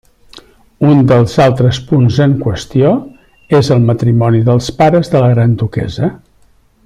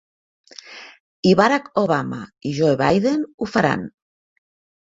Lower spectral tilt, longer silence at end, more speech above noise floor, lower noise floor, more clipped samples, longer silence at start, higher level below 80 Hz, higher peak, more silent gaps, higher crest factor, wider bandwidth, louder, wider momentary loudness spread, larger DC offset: about the same, -7.5 dB/octave vs -6.5 dB/octave; second, 0.7 s vs 0.95 s; first, 39 dB vs 22 dB; first, -49 dBFS vs -41 dBFS; neither; second, 0.35 s vs 0.65 s; first, -40 dBFS vs -56 dBFS; about the same, 0 dBFS vs -2 dBFS; second, none vs 1.00-1.23 s, 3.34-3.38 s; second, 10 dB vs 20 dB; first, 10.5 kHz vs 7.8 kHz; first, -11 LUFS vs -19 LUFS; second, 7 LU vs 21 LU; neither